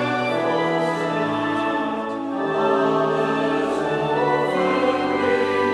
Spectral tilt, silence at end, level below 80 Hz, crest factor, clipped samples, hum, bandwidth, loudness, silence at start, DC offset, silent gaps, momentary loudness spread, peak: -6 dB/octave; 0 s; -60 dBFS; 14 dB; under 0.1%; none; 12 kHz; -21 LUFS; 0 s; under 0.1%; none; 4 LU; -8 dBFS